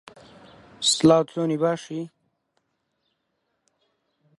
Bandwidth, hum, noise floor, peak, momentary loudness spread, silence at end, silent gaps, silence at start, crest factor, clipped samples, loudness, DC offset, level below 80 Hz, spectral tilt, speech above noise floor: 11.5 kHz; none; -76 dBFS; -4 dBFS; 17 LU; 2.3 s; none; 0.8 s; 22 dB; under 0.1%; -21 LUFS; under 0.1%; -62 dBFS; -4 dB/octave; 54 dB